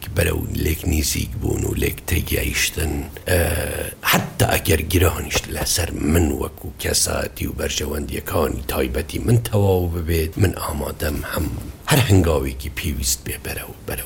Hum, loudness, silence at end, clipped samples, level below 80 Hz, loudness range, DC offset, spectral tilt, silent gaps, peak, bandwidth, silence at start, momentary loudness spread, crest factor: none; -21 LUFS; 0 s; under 0.1%; -30 dBFS; 2 LU; under 0.1%; -4.5 dB/octave; none; -2 dBFS; 17 kHz; 0 s; 9 LU; 18 dB